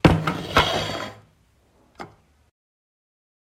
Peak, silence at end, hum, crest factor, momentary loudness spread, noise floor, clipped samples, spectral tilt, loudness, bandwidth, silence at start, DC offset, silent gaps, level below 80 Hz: 0 dBFS; 1.45 s; none; 26 dB; 23 LU; -60 dBFS; under 0.1%; -5.5 dB/octave; -22 LUFS; 16 kHz; 0.05 s; under 0.1%; none; -40 dBFS